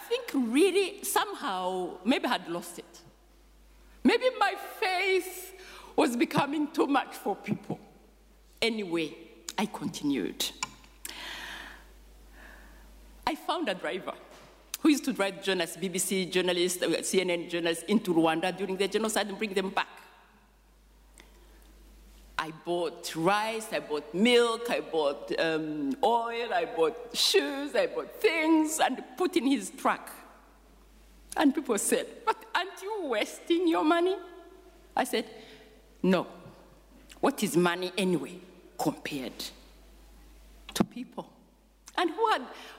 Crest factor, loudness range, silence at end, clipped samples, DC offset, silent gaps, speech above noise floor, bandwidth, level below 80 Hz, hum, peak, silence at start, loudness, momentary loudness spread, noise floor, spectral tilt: 18 dB; 9 LU; 0 s; under 0.1%; under 0.1%; none; 31 dB; 16 kHz; -60 dBFS; none; -12 dBFS; 0 s; -29 LUFS; 14 LU; -60 dBFS; -3.5 dB/octave